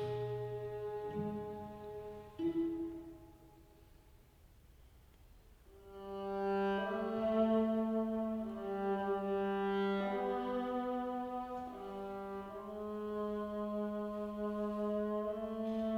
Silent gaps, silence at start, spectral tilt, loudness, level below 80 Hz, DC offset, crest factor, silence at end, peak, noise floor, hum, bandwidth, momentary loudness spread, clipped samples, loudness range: none; 0 s; -8 dB/octave; -39 LUFS; -64 dBFS; under 0.1%; 16 dB; 0 s; -22 dBFS; -63 dBFS; none; 14.5 kHz; 11 LU; under 0.1%; 9 LU